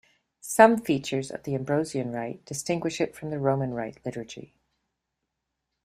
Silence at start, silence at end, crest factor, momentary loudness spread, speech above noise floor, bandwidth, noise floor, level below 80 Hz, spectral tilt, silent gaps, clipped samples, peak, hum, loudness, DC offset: 0.45 s; 1.4 s; 26 dB; 17 LU; 57 dB; 15.5 kHz; -83 dBFS; -64 dBFS; -5.5 dB/octave; none; under 0.1%; -2 dBFS; none; -26 LUFS; under 0.1%